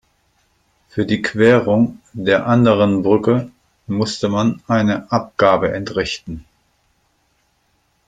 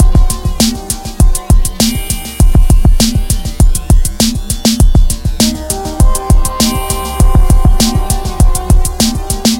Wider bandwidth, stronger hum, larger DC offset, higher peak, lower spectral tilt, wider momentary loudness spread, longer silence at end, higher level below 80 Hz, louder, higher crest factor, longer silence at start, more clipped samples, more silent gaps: second, 9.2 kHz vs 17 kHz; neither; neither; about the same, 0 dBFS vs 0 dBFS; first, -6.5 dB/octave vs -4.5 dB/octave; first, 11 LU vs 6 LU; first, 1.65 s vs 0 s; second, -50 dBFS vs -10 dBFS; second, -17 LUFS vs -12 LUFS; first, 18 dB vs 8 dB; first, 0.95 s vs 0 s; second, under 0.1% vs 0.3%; neither